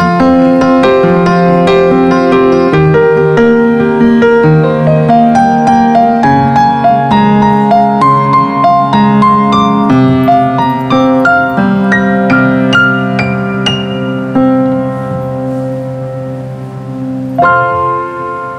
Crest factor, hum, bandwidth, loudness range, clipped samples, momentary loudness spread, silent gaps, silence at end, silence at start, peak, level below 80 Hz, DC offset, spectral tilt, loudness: 8 dB; none; 9.8 kHz; 7 LU; under 0.1%; 9 LU; none; 0 s; 0 s; 0 dBFS; -40 dBFS; under 0.1%; -7.5 dB/octave; -8 LUFS